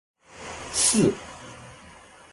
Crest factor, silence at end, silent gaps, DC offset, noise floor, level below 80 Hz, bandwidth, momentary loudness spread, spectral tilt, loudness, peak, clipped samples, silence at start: 20 dB; 0.4 s; none; under 0.1%; -49 dBFS; -54 dBFS; 12 kHz; 24 LU; -3 dB/octave; -22 LUFS; -8 dBFS; under 0.1%; 0.35 s